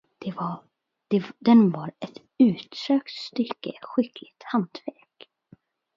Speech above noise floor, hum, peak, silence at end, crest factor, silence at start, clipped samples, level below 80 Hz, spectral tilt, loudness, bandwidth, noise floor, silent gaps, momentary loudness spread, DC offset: 33 dB; none; -6 dBFS; 1.05 s; 20 dB; 0.2 s; under 0.1%; -74 dBFS; -7.5 dB/octave; -25 LUFS; 7.2 kHz; -57 dBFS; none; 21 LU; under 0.1%